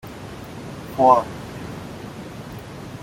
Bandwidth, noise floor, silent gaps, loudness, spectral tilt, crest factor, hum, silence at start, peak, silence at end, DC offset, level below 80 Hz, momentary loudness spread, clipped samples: 16.5 kHz; -36 dBFS; none; -19 LUFS; -6.5 dB/octave; 22 dB; none; 0.05 s; -2 dBFS; 0.05 s; under 0.1%; -50 dBFS; 20 LU; under 0.1%